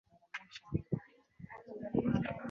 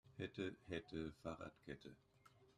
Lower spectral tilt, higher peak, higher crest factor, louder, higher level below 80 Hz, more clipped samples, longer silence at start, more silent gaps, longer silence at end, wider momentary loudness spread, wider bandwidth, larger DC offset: about the same, -7 dB/octave vs -6.5 dB/octave; first, -18 dBFS vs -32 dBFS; about the same, 20 dB vs 20 dB; first, -39 LUFS vs -51 LUFS; first, -58 dBFS vs -72 dBFS; neither; first, 0.35 s vs 0.05 s; neither; about the same, 0 s vs 0.05 s; first, 18 LU vs 10 LU; second, 7.2 kHz vs 13.5 kHz; neither